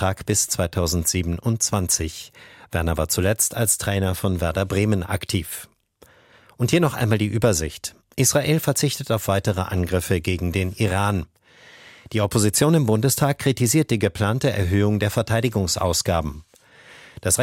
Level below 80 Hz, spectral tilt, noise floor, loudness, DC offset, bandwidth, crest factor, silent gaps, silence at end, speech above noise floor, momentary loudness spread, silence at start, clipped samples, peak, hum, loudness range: -40 dBFS; -4.5 dB/octave; -54 dBFS; -21 LUFS; under 0.1%; 16.5 kHz; 18 dB; none; 0 s; 33 dB; 8 LU; 0 s; under 0.1%; -4 dBFS; none; 4 LU